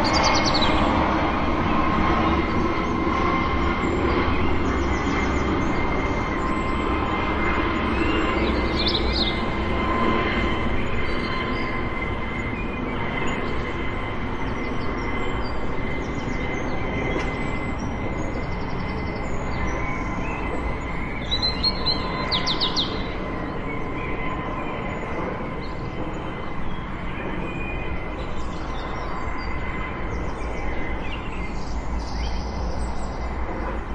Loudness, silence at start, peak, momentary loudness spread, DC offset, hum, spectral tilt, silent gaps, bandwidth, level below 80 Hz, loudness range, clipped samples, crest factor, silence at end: -25 LUFS; 0 s; -6 dBFS; 9 LU; under 0.1%; none; -5.5 dB/octave; none; 8.6 kHz; -30 dBFS; 8 LU; under 0.1%; 18 dB; 0 s